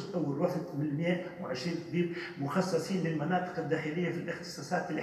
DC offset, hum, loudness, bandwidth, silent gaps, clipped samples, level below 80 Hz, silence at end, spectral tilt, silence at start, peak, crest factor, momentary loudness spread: under 0.1%; none; -34 LUFS; 13.5 kHz; none; under 0.1%; -72 dBFS; 0 s; -6.5 dB/octave; 0 s; -16 dBFS; 16 dB; 6 LU